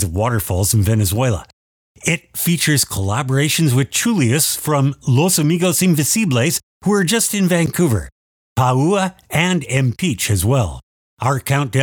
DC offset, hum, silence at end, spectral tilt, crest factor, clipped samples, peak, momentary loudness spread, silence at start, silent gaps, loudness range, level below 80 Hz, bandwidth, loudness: under 0.1%; none; 0 s; -4.5 dB/octave; 16 dB; under 0.1%; -2 dBFS; 5 LU; 0 s; 1.53-1.95 s, 6.63-6.81 s, 8.12-8.56 s, 10.83-11.17 s; 2 LU; -42 dBFS; over 20 kHz; -17 LUFS